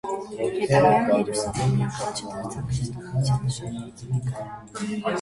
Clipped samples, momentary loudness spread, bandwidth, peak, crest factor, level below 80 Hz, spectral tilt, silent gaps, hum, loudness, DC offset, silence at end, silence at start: under 0.1%; 14 LU; 11.5 kHz; -6 dBFS; 18 dB; -48 dBFS; -6 dB/octave; none; none; -25 LUFS; under 0.1%; 0 s; 0.05 s